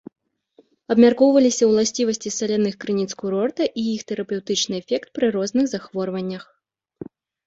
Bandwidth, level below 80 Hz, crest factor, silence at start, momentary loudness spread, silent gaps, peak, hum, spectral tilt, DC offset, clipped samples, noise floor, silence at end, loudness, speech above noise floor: 8 kHz; -64 dBFS; 18 dB; 0.9 s; 13 LU; none; -2 dBFS; none; -4.5 dB/octave; under 0.1%; under 0.1%; -58 dBFS; 0.45 s; -21 LUFS; 38 dB